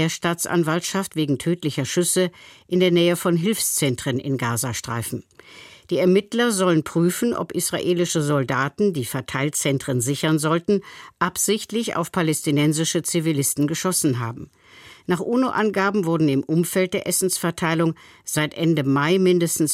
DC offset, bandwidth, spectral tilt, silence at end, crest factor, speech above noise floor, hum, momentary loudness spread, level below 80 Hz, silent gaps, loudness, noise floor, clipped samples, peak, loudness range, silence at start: under 0.1%; 16.5 kHz; -4.5 dB/octave; 0 s; 16 dB; 26 dB; none; 7 LU; -60 dBFS; none; -21 LUFS; -47 dBFS; under 0.1%; -6 dBFS; 1 LU; 0 s